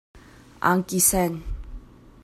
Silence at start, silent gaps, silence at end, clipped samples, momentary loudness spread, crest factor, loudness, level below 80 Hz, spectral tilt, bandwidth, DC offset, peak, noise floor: 0.15 s; none; 0.4 s; under 0.1%; 19 LU; 20 dB; -21 LUFS; -40 dBFS; -3.5 dB/octave; 16 kHz; under 0.1%; -6 dBFS; -42 dBFS